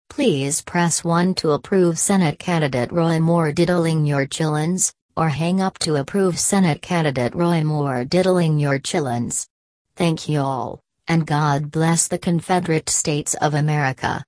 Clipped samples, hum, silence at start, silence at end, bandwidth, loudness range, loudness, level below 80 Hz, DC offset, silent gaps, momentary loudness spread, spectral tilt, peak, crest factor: under 0.1%; none; 0.1 s; 0.05 s; 11 kHz; 3 LU; -19 LUFS; -52 dBFS; under 0.1%; 5.02-5.09 s, 9.50-9.85 s; 5 LU; -5 dB/octave; 0 dBFS; 18 dB